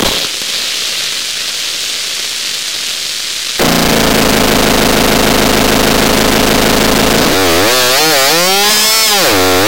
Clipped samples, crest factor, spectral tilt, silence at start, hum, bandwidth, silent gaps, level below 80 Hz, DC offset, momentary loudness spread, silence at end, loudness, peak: under 0.1%; 10 dB; -2.5 dB/octave; 0 s; none; 17.5 kHz; none; -28 dBFS; 5%; 8 LU; 0 s; -9 LUFS; 0 dBFS